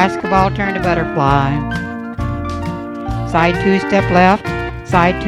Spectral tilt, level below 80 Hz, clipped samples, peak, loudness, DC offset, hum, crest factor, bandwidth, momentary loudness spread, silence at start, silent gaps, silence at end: -7 dB/octave; -30 dBFS; under 0.1%; 0 dBFS; -16 LUFS; under 0.1%; none; 16 dB; 12.5 kHz; 11 LU; 0 s; none; 0 s